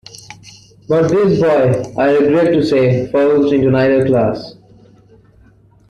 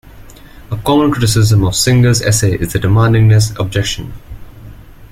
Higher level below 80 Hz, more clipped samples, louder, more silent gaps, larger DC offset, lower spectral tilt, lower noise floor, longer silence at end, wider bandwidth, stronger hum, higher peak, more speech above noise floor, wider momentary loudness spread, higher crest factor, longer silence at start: second, -46 dBFS vs -32 dBFS; neither; about the same, -13 LUFS vs -12 LUFS; neither; neither; first, -7.5 dB/octave vs -5 dB/octave; first, -47 dBFS vs -35 dBFS; first, 1.35 s vs 0.05 s; second, 11 kHz vs 15.5 kHz; neither; second, -4 dBFS vs 0 dBFS; first, 35 dB vs 24 dB; second, 7 LU vs 10 LU; about the same, 12 dB vs 12 dB; first, 0.3 s vs 0.15 s